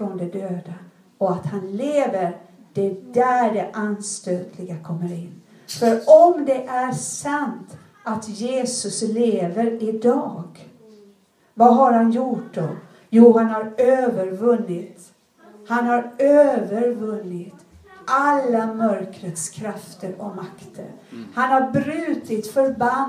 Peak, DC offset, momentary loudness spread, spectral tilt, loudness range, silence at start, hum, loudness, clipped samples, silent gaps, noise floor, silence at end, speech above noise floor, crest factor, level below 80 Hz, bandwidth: 0 dBFS; under 0.1%; 19 LU; -5.5 dB/octave; 6 LU; 0 s; none; -20 LUFS; under 0.1%; none; -56 dBFS; 0 s; 36 dB; 20 dB; -68 dBFS; 14.5 kHz